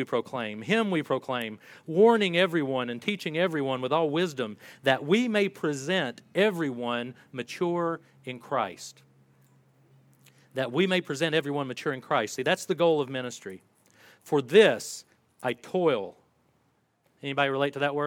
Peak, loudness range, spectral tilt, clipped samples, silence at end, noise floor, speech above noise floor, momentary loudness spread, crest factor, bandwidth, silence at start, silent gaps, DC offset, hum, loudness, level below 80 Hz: -6 dBFS; 6 LU; -5 dB/octave; under 0.1%; 0 s; -70 dBFS; 43 dB; 15 LU; 22 dB; 16.5 kHz; 0 s; none; under 0.1%; none; -27 LUFS; -80 dBFS